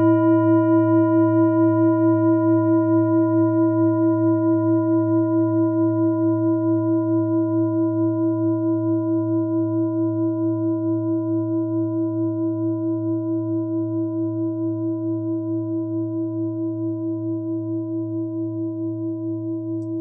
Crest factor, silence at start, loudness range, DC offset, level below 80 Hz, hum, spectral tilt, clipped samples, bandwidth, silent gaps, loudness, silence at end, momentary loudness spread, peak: 12 dB; 0 s; 8 LU; under 0.1%; -74 dBFS; none; -14 dB/octave; under 0.1%; 2 kHz; none; -21 LUFS; 0 s; 9 LU; -8 dBFS